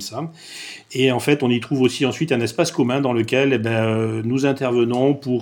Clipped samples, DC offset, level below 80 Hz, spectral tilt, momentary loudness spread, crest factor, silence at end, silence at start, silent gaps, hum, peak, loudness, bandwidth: under 0.1%; under 0.1%; -62 dBFS; -5.5 dB/octave; 11 LU; 16 dB; 0 s; 0 s; none; none; -2 dBFS; -19 LUFS; 18 kHz